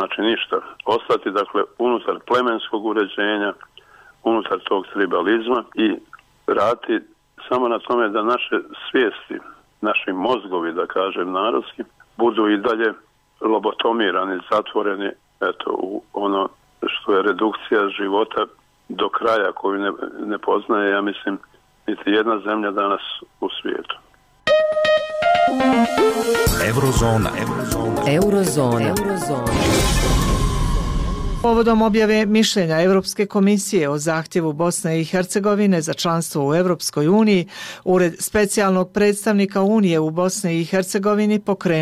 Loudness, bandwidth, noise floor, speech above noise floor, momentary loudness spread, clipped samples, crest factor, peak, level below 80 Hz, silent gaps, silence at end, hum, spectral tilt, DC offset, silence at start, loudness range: -19 LUFS; 16 kHz; -48 dBFS; 29 dB; 9 LU; under 0.1%; 12 dB; -8 dBFS; -34 dBFS; none; 0 s; none; -5 dB/octave; under 0.1%; 0 s; 4 LU